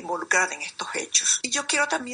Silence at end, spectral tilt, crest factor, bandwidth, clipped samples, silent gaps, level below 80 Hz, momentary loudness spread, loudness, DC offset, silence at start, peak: 0 s; 1 dB/octave; 20 dB; 10.5 kHz; under 0.1%; none; -72 dBFS; 10 LU; -23 LUFS; under 0.1%; 0 s; -6 dBFS